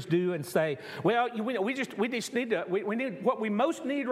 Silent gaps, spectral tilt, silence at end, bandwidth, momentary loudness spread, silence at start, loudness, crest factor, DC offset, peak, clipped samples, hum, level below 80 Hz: none; -5.5 dB/octave; 0 s; 15.5 kHz; 3 LU; 0 s; -30 LUFS; 16 dB; under 0.1%; -12 dBFS; under 0.1%; none; -80 dBFS